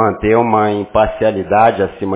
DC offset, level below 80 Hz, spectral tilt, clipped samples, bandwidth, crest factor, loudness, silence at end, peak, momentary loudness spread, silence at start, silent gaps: under 0.1%; -36 dBFS; -10.5 dB/octave; under 0.1%; 4 kHz; 14 dB; -14 LUFS; 0 s; 0 dBFS; 4 LU; 0 s; none